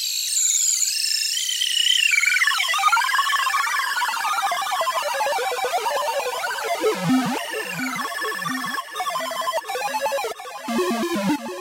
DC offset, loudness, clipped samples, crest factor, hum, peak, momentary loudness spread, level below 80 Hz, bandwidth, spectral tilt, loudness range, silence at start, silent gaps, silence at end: under 0.1%; -21 LUFS; under 0.1%; 16 dB; none; -6 dBFS; 9 LU; -70 dBFS; 16 kHz; -1 dB/octave; 7 LU; 0 s; none; 0 s